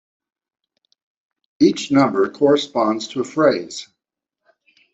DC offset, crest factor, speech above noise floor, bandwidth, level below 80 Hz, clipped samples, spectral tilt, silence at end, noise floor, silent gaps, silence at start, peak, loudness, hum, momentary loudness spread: under 0.1%; 18 dB; 65 dB; 8 kHz; -64 dBFS; under 0.1%; -5 dB/octave; 1.1 s; -83 dBFS; none; 1.6 s; -2 dBFS; -18 LUFS; none; 9 LU